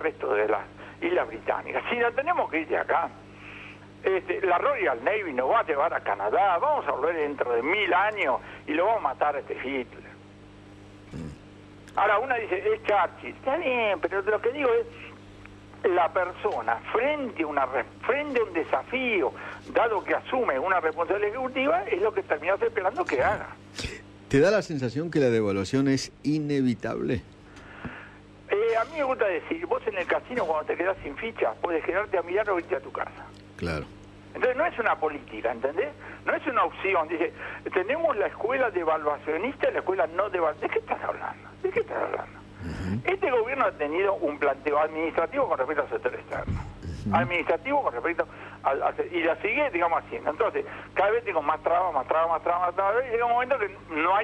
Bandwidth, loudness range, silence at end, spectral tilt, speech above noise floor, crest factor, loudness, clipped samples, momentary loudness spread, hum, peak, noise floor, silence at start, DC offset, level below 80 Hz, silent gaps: 10.5 kHz; 4 LU; 0 s; -6 dB/octave; 22 dB; 16 dB; -27 LUFS; under 0.1%; 11 LU; 50 Hz at -50 dBFS; -12 dBFS; -48 dBFS; 0 s; under 0.1%; -54 dBFS; none